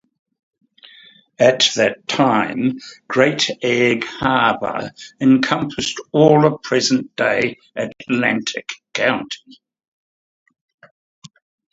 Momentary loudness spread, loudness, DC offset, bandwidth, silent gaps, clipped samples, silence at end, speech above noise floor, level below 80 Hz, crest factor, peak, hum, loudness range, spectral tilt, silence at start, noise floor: 13 LU; -17 LUFS; under 0.1%; 8 kHz; none; under 0.1%; 2.35 s; 30 dB; -58 dBFS; 20 dB; 0 dBFS; none; 7 LU; -4.5 dB/octave; 1.4 s; -48 dBFS